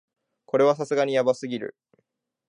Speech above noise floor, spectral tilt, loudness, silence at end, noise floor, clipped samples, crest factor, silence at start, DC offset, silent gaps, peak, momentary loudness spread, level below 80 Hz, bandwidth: 50 dB; -5.5 dB/octave; -24 LUFS; 0.8 s; -73 dBFS; under 0.1%; 18 dB; 0.55 s; under 0.1%; none; -8 dBFS; 12 LU; -78 dBFS; 10.5 kHz